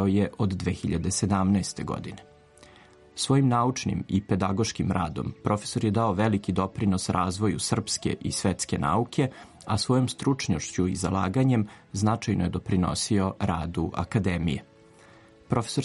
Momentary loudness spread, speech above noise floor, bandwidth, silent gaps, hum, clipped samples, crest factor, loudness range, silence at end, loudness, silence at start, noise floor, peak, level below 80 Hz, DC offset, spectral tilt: 7 LU; 27 dB; 11.5 kHz; none; none; under 0.1%; 16 dB; 2 LU; 0 s; -27 LUFS; 0 s; -53 dBFS; -10 dBFS; -48 dBFS; under 0.1%; -5.5 dB/octave